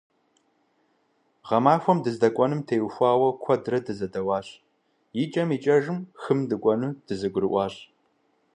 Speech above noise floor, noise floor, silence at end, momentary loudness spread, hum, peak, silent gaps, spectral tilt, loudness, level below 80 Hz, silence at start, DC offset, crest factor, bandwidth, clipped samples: 45 dB; -69 dBFS; 0.7 s; 10 LU; none; -6 dBFS; none; -7.5 dB/octave; -25 LUFS; -64 dBFS; 1.45 s; under 0.1%; 20 dB; 10 kHz; under 0.1%